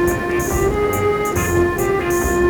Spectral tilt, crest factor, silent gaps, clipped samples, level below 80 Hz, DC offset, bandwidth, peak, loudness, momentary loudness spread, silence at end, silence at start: -5.5 dB/octave; 12 dB; none; under 0.1%; -30 dBFS; under 0.1%; over 20 kHz; -4 dBFS; -18 LUFS; 2 LU; 0 s; 0 s